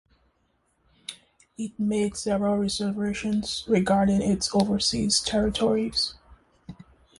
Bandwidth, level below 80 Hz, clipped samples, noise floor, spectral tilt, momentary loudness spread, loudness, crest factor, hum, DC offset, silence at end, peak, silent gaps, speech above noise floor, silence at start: 11.5 kHz; -48 dBFS; under 0.1%; -70 dBFS; -4.5 dB/octave; 14 LU; -25 LUFS; 18 dB; none; under 0.1%; 0.45 s; -8 dBFS; none; 45 dB; 1.1 s